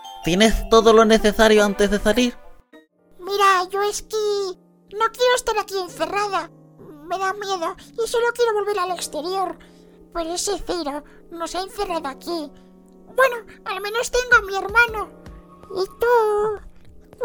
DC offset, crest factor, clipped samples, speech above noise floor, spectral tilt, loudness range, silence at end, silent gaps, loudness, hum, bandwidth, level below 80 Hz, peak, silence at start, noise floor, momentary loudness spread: under 0.1%; 20 dB; under 0.1%; 32 dB; -3.5 dB/octave; 9 LU; 0 s; none; -20 LUFS; none; over 20 kHz; -38 dBFS; 0 dBFS; 0 s; -52 dBFS; 15 LU